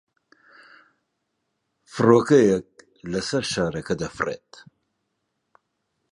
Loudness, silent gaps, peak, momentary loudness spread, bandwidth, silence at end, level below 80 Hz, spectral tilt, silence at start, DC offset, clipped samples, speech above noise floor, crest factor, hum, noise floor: -22 LUFS; none; -2 dBFS; 17 LU; 11 kHz; 1.75 s; -56 dBFS; -5.5 dB/octave; 1.95 s; under 0.1%; under 0.1%; 56 dB; 22 dB; none; -77 dBFS